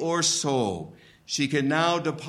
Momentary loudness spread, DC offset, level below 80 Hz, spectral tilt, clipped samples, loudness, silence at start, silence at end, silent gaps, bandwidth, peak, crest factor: 11 LU; under 0.1%; -64 dBFS; -3.5 dB/octave; under 0.1%; -25 LUFS; 0 s; 0 s; none; 13.5 kHz; -8 dBFS; 18 dB